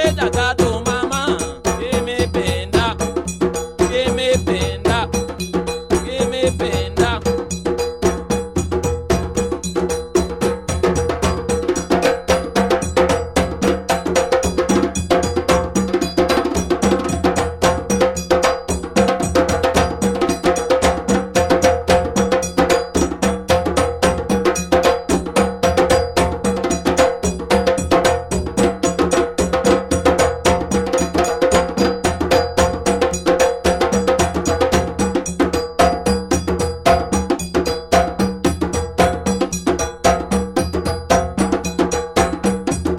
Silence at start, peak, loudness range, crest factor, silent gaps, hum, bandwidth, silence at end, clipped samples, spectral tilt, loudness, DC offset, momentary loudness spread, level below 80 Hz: 0 s; -2 dBFS; 3 LU; 16 dB; none; none; 16.5 kHz; 0 s; under 0.1%; -4.5 dB/octave; -18 LUFS; under 0.1%; 5 LU; -30 dBFS